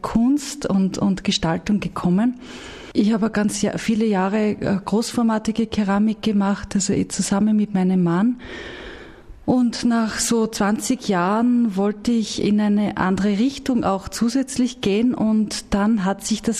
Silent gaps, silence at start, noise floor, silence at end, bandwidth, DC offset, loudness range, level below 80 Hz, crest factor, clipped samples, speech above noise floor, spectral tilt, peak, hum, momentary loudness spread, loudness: none; 0.05 s; -40 dBFS; 0 s; 13.5 kHz; under 0.1%; 1 LU; -44 dBFS; 16 dB; under 0.1%; 21 dB; -5.5 dB/octave; -4 dBFS; none; 4 LU; -20 LUFS